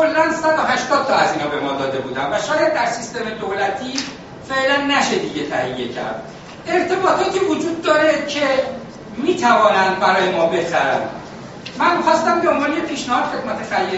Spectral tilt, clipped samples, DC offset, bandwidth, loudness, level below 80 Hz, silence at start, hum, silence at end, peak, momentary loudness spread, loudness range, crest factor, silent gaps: -2 dB/octave; under 0.1%; under 0.1%; 8 kHz; -18 LUFS; -52 dBFS; 0 s; none; 0 s; -2 dBFS; 12 LU; 4 LU; 18 dB; none